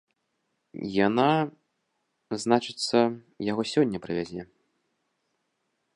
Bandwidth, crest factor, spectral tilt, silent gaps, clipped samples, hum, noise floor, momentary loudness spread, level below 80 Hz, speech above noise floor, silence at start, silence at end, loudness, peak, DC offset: 11 kHz; 24 dB; -5.5 dB/octave; none; under 0.1%; none; -77 dBFS; 14 LU; -64 dBFS; 51 dB; 0.75 s; 1.5 s; -26 LUFS; -6 dBFS; under 0.1%